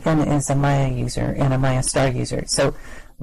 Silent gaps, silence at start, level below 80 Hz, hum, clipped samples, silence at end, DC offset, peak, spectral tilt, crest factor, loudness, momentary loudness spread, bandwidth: none; 0 s; -34 dBFS; none; under 0.1%; 0 s; under 0.1%; -8 dBFS; -5.5 dB/octave; 12 dB; -20 LUFS; 5 LU; 12.5 kHz